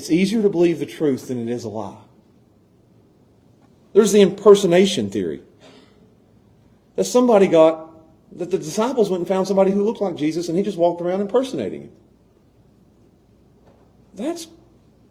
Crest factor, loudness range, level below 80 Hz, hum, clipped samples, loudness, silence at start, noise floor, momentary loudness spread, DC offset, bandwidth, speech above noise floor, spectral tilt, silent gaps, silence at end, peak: 20 dB; 10 LU; -62 dBFS; none; under 0.1%; -18 LUFS; 0 s; -55 dBFS; 17 LU; under 0.1%; 16 kHz; 37 dB; -5.5 dB/octave; none; 0.65 s; 0 dBFS